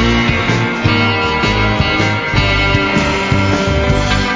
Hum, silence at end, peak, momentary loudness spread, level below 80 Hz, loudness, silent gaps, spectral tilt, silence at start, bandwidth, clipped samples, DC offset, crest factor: none; 0 s; 0 dBFS; 2 LU; -24 dBFS; -13 LUFS; none; -5.5 dB/octave; 0 s; 7.8 kHz; under 0.1%; under 0.1%; 12 dB